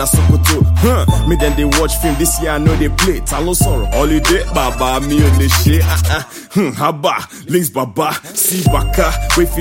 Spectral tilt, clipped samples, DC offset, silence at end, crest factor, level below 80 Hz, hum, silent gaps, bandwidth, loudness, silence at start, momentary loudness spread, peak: -4.5 dB/octave; under 0.1%; under 0.1%; 0 s; 12 dB; -18 dBFS; none; none; 17 kHz; -14 LUFS; 0 s; 6 LU; 0 dBFS